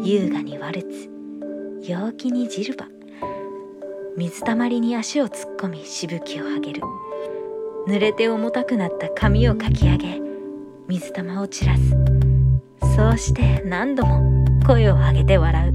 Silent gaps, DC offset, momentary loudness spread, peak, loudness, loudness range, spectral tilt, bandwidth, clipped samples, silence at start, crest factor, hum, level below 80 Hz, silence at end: none; under 0.1%; 16 LU; -2 dBFS; -21 LUFS; 10 LU; -7 dB/octave; 11 kHz; under 0.1%; 0 s; 18 dB; none; -26 dBFS; 0 s